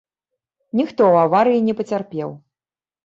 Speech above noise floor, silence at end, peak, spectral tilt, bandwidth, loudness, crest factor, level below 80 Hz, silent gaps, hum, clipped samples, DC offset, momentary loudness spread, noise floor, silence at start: over 73 dB; 0.7 s; -4 dBFS; -8 dB/octave; 7.6 kHz; -18 LUFS; 16 dB; -64 dBFS; none; none; under 0.1%; under 0.1%; 14 LU; under -90 dBFS; 0.75 s